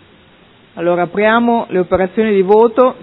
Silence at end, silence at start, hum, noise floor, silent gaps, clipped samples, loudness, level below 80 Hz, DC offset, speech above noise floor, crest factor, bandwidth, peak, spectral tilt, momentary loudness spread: 0.1 s; 0.75 s; none; -46 dBFS; none; 0.1%; -13 LUFS; -46 dBFS; under 0.1%; 34 dB; 14 dB; 4.1 kHz; 0 dBFS; -10 dB/octave; 6 LU